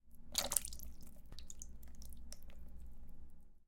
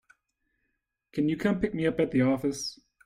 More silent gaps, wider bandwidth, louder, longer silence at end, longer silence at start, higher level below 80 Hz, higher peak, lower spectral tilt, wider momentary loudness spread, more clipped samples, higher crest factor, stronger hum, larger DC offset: neither; about the same, 17 kHz vs 15.5 kHz; second, -41 LUFS vs -28 LUFS; second, 0.05 s vs 0.3 s; second, 0.05 s vs 1.15 s; about the same, -54 dBFS vs -56 dBFS; first, -8 dBFS vs -12 dBFS; second, -1 dB/octave vs -6 dB/octave; first, 24 LU vs 10 LU; neither; first, 36 dB vs 18 dB; neither; neither